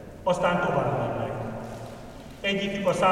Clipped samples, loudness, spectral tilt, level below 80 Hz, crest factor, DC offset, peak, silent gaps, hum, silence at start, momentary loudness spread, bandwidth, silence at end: under 0.1%; -27 LUFS; -5.5 dB/octave; -50 dBFS; 18 dB; under 0.1%; -8 dBFS; none; none; 0 s; 16 LU; 15.5 kHz; 0 s